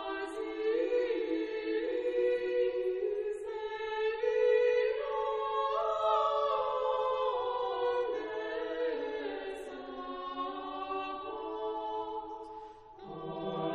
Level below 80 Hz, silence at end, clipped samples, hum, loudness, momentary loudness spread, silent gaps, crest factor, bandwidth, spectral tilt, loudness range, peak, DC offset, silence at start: -66 dBFS; 0 s; under 0.1%; none; -33 LUFS; 12 LU; none; 16 dB; 9.6 kHz; -5.5 dB/octave; 9 LU; -18 dBFS; under 0.1%; 0 s